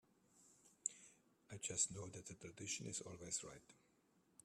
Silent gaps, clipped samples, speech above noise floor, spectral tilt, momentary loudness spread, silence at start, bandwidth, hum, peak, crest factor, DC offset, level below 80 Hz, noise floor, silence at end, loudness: none; under 0.1%; 29 dB; -2 dB/octave; 19 LU; 0.35 s; 14.5 kHz; none; -22 dBFS; 28 dB; under 0.1%; -80 dBFS; -78 dBFS; 0.7 s; -46 LUFS